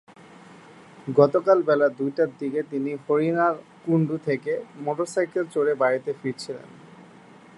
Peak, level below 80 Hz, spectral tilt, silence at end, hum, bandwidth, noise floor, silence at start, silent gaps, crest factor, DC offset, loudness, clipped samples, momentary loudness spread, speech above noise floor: -2 dBFS; -74 dBFS; -7 dB/octave; 0.55 s; none; 11.5 kHz; -49 dBFS; 0.5 s; none; 22 dB; under 0.1%; -24 LUFS; under 0.1%; 12 LU; 26 dB